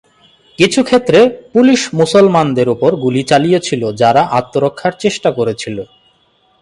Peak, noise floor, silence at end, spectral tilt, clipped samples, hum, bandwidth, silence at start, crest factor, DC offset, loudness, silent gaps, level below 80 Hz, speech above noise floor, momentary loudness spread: 0 dBFS; -55 dBFS; 0.75 s; -5.5 dB/octave; under 0.1%; none; 11.5 kHz; 0.6 s; 12 dB; under 0.1%; -12 LUFS; none; -52 dBFS; 43 dB; 8 LU